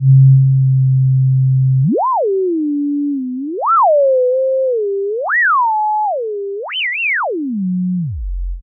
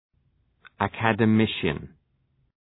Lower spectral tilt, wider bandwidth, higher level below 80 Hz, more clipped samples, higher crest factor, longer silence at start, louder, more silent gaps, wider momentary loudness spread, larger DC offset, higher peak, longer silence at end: second, -6.5 dB/octave vs -10 dB/octave; second, 3.3 kHz vs 4.1 kHz; first, -34 dBFS vs -54 dBFS; neither; second, 12 dB vs 22 dB; second, 0 s vs 0.8 s; first, -14 LUFS vs -24 LUFS; neither; about the same, 10 LU vs 9 LU; neither; about the same, -2 dBFS vs -4 dBFS; second, 0 s vs 0.75 s